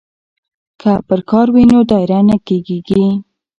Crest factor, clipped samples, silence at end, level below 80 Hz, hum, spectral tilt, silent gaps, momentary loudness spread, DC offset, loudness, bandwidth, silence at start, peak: 12 dB; under 0.1%; 0.35 s; -42 dBFS; none; -9 dB/octave; none; 9 LU; under 0.1%; -12 LUFS; 7.8 kHz; 0.85 s; 0 dBFS